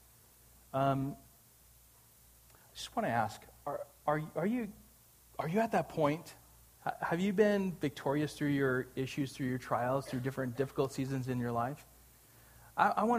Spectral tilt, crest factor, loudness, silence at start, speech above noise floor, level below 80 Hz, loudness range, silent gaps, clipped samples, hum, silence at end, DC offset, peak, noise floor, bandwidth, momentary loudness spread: -6.5 dB/octave; 22 dB; -35 LUFS; 0.75 s; 28 dB; -66 dBFS; 5 LU; none; under 0.1%; none; 0 s; under 0.1%; -12 dBFS; -62 dBFS; 15.5 kHz; 11 LU